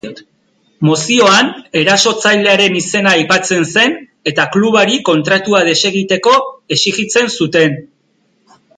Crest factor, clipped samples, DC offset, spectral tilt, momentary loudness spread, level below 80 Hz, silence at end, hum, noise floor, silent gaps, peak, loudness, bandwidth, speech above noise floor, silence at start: 12 dB; under 0.1%; under 0.1%; -3.5 dB/octave; 6 LU; -58 dBFS; 0.95 s; none; -58 dBFS; none; 0 dBFS; -11 LUFS; 11 kHz; 46 dB; 0.05 s